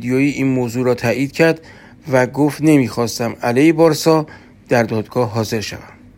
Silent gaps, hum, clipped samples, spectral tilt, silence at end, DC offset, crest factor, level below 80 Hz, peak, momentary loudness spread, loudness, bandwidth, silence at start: none; none; under 0.1%; -6 dB/octave; 0.25 s; under 0.1%; 16 dB; -52 dBFS; 0 dBFS; 9 LU; -16 LUFS; 16.5 kHz; 0 s